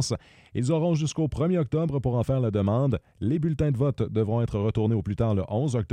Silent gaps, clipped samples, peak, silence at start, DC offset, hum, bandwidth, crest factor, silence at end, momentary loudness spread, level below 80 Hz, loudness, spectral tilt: none; under 0.1%; -12 dBFS; 0 s; under 0.1%; none; 10.5 kHz; 12 dB; 0 s; 4 LU; -46 dBFS; -26 LUFS; -7.5 dB/octave